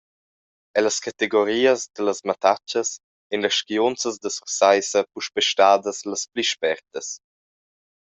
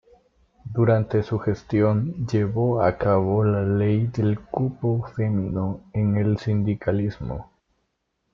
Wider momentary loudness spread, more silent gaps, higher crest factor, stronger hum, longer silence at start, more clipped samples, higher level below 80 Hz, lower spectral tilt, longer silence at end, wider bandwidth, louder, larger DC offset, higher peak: first, 12 LU vs 8 LU; first, 3.04-3.30 s vs none; about the same, 20 dB vs 16 dB; neither; about the same, 0.75 s vs 0.65 s; neither; second, -70 dBFS vs -48 dBFS; second, -1.5 dB/octave vs -9.5 dB/octave; about the same, 0.95 s vs 0.9 s; first, 8.2 kHz vs 6.4 kHz; about the same, -22 LUFS vs -23 LUFS; neither; first, -2 dBFS vs -6 dBFS